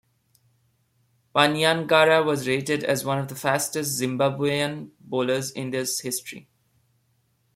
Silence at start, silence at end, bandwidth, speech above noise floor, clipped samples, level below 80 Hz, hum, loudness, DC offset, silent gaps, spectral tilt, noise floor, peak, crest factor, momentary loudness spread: 1.35 s; 1.15 s; 16.5 kHz; 45 dB; under 0.1%; -66 dBFS; none; -23 LUFS; under 0.1%; none; -3.5 dB/octave; -68 dBFS; -4 dBFS; 20 dB; 11 LU